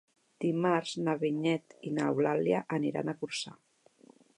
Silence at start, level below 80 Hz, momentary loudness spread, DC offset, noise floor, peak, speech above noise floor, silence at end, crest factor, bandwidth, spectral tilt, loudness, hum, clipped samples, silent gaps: 0.4 s; -78 dBFS; 8 LU; under 0.1%; -61 dBFS; -14 dBFS; 30 dB; 0.85 s; 18 dB; 11.5 kHz; -6 dB/octave; -32 LUFS; none; under 0.1%; none